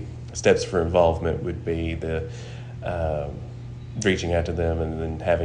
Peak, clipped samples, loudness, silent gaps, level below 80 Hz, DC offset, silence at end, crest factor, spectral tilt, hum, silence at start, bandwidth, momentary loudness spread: -6 dBFS; under 0.1%; -25 LUFS; none; -38 dBFS; under 0.1%; 0 s; 18 dB; -5.5 dB/octave; none; 0 s; 10 kHz; 15 LU